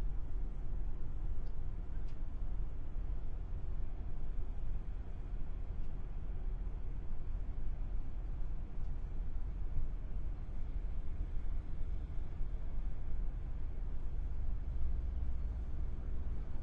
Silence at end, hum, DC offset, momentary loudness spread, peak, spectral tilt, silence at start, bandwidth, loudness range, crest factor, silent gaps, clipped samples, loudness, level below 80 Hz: 0 s; none; under 0.1%; 3 LU; -22 dBFS; -9 dB/octave; 0 s; 2.6 kHz; 3 LU; 14 dB; none; under 0.1%; -45 LUFS; -38 dBFS